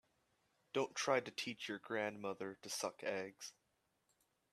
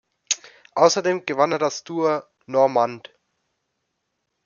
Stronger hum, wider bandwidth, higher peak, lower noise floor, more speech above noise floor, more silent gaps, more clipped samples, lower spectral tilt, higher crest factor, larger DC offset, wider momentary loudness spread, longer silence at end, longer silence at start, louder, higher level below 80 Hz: neither; first, 14 kHz vs 7.4 kHz; second, -22 dBFS vs -2 dBFS; first, -83 dBFS vs -76 dBFS; second, 40 dB vs 56 dB; neither; neither; about the same, -3 dB/octave vs -3.5 dB/octave; about the same, 24 dB vs 20 dB; neither; about the same, 10 LU vs 8 LU; second, 1 s vs 1.5 s; first, 0.75 s vs 0.3 s; second, -42 LUFS vs -22 LUFS; second, -88 dBFS vs -74 dBFS